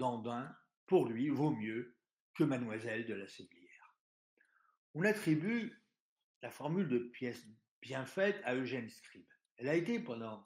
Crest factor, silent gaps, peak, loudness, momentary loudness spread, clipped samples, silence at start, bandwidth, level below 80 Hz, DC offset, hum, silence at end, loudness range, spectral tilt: 20 dB; 0.77-0.87 s, 2.20-2.34 s, 4.00-4.37 s, 4.77-4.94 s, 6.00-6.16 s, 6.23-6.41 s, 7.71-7.82 s, 9.51-9.56 s; -18 dBFS; -38 LUFS; 17 LU; under 0.1%; 0 s; 15.5 kHz; -84 dBFS; under 0.1%; none; 0.05 s; 3 LU; -7 dB/octave